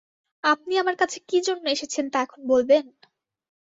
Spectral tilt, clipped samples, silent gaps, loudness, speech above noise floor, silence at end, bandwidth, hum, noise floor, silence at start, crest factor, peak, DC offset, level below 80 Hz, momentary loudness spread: -1.5 dB/octave; under 0.1%; none; -23 LUFS; 40 dB; 0.8 s; 7.8 kHz; none; -62 dBFS; 0.45 s; 18 dB; -8 dBFS; under 0.1%; -68 dBFS; 6 LU